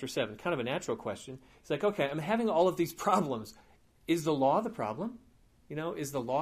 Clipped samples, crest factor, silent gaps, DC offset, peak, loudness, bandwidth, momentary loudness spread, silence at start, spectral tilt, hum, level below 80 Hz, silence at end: under 0.1%; 20 dB; none; under 0.1%; -12 dBFS; -32 LUFS; 15.5 kHz; 14 LU; 0 s; -5.5 dB/octave; none; -66 dBFS; 0 s